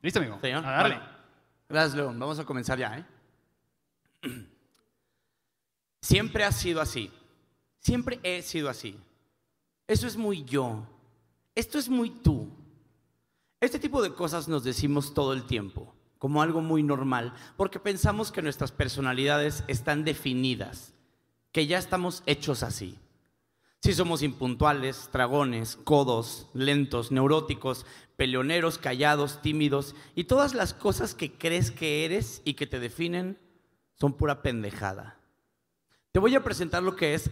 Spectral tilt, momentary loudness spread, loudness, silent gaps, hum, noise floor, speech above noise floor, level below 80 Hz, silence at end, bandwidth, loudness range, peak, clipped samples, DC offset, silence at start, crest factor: -5 dB/octave; 11 LU; -28 LUFS; none; none; -85 dBFS; 57 dB; -46 dBFS; 0 s; 16 kHz; 6 LU; -6 dBFS; under 0.1%; under 0.1%; 0.05 s; 22 dB